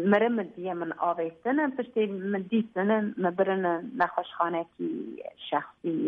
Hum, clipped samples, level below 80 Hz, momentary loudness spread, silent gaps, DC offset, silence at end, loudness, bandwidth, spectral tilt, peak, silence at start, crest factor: none; under 0.1%; -74 dBFS; 8 LU; none; under 0.1%; 0 s; -29 LUFS; 4.7 kHz; -9 dB/octave; -10 dBFS; 0 s; 18 dB